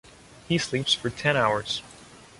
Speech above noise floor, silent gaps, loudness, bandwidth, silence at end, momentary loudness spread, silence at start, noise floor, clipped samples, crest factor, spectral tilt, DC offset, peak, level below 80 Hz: 23 dB; none; -25 LUFS; 11.5 kHz; 0.15 s; 7 LU; 0.3 s; -49 dBFS; under 0.1%; 20 dB; -4 dB/octave; under 0.1%; -8 dBFS; -56 dBFS